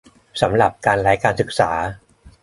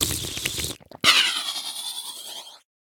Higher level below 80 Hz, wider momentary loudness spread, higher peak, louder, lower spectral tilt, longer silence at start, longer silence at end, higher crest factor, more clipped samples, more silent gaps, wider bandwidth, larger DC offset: first, -44 dBFS vs -50 dBFS; second, 9 LU vs 18 LU; about the same, -2 dBFS vs -2 dBFS; first, -18 LUFS vs -22 LUFS; first, -5.5 dB/octave vs -0.5 dB/octave; first, 0.35 s vs 0 s; second, 0.15 s vs 0.35 s; second, 18 dB vs 26 dB; neither; neither; second, 11.5 kHz vs 19.5 kHz; neither